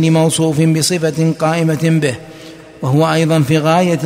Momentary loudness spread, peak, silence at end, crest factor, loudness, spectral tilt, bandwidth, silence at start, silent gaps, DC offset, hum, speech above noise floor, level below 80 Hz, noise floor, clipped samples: 9 LU; -2 dBFS; 0 s; 12 dB; -14 LUFS; -5.5 dB/octave; 16 kHz; 0 s; none; under 0.1%; none; 22 dB; -52 dBFS; -35 dBFS; under 0.1%